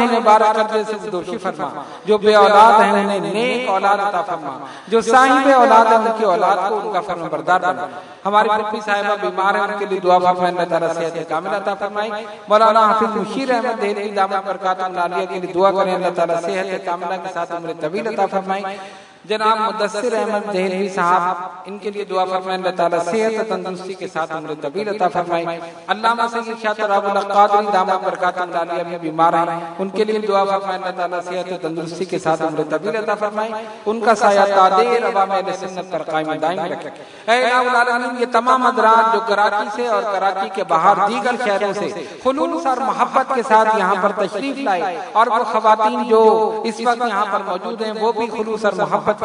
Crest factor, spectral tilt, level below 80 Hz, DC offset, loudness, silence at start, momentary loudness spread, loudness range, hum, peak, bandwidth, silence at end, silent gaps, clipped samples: 18 dB; -4.5 dB/octave; -68 dBFS; under 0.1%; -17 LUFS; 0 s; 12 LU; 6 LU; none; 0 dBFS; 11 kHz; 0 s; none; under 0.1%